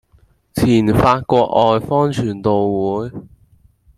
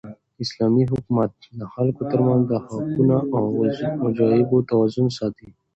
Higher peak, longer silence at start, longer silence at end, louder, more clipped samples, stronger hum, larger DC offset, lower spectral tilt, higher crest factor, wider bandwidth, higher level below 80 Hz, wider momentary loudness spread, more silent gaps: first, -2 dBFS vs -6 dBFS; first, 0.55 s vs 0.05 s; first, 0.7 s vs 0.25 s; first, -16 LUFS vs -21 LUFS; neither; neither; neither; second, -7 dB/octave vs -8.5 dB/octave; about the same, 16 dB vs 16 dB; first, 15.5 kHz vs 8 kHz; first, -42 dBFS vs -54 dBFS; about the same, 11 LU vs 10 LU; neither